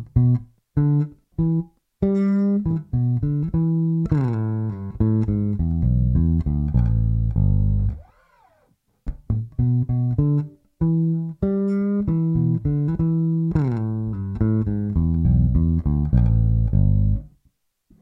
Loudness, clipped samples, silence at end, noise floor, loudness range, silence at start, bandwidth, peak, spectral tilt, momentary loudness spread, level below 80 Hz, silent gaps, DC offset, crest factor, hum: -22 LUFS; under 0.1%; 0.75 s; -65 dBFS; 3 LU; 0 s; 2.6 kHz; -4 dBFS; -12.5 dB/octave; 7 LU; -28 dBFS; none; under 0.1%; 16 dB; none